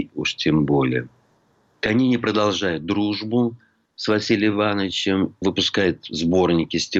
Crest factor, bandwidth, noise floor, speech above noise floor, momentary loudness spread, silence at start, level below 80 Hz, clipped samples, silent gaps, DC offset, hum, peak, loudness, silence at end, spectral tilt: 14 dB; 8 kHz; -61 dBFS; 41 dB; 6 LU; 0 s; -52 dBFS; under 0.1%; none; under 0.1%; none; -8 dBFS; -21 LUFS; 0 s; -5 dB/octave